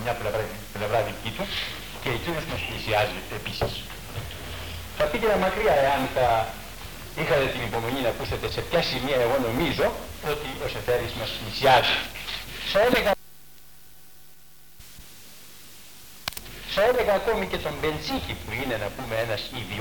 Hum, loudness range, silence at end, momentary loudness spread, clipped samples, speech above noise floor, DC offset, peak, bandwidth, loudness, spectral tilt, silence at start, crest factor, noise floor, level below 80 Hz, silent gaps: none; 5 LU; 0 s; 15 LU; under 0.1%; 28 dB; 0.6%; -6 dBFS; 19 kHz; -26 LUFS; -4.5 dB/octave; 0 s; 20 dB; -53 dBFS; -44 dBFS; none